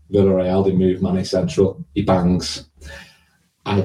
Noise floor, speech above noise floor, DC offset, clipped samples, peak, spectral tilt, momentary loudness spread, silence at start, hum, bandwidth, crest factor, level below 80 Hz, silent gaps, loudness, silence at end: -59 dBFS; 41 dB; under 0.1%; under 0.1%; -4 dBFS; -7 dB/octave; 21 LU; 0.1 s; none; 11 kHz; 16 dB; -44 dBFS; none; -18 LUFS; 0 s